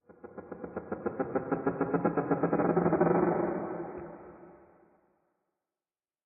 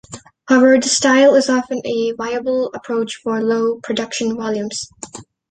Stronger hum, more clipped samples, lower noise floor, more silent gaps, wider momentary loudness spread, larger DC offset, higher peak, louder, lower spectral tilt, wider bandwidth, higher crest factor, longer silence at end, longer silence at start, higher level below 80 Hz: neither; neither; first, under -90 dBFS vs -36 dBFS; neither; first, 20 LU vs 15 LU; neither; second, -12 dBFS vs -2 dBFS; second, -31 LUFS vs -16 LUFS; first, -5 dB/octave vs -3 dB/octave; second, 2.8 kHz vs 9.4 kHz; about the same, 20 dB vs 16 dB; first, 1.7 s vs 0.3 s; about the same, 0.1 s vs 0.1 s; second, -66 dBFS vs -58 dBFS